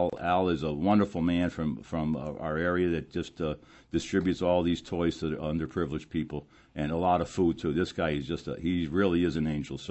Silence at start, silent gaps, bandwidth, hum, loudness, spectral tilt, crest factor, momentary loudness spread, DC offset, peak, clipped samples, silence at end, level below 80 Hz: 0 s; none; 8.4 kHz; none; -30 LUFS; -7 dB/octave; 18 dB; 9 LU; under 0.1%; -12 dBFS; under 0.1%; 0 s; -50 dBFS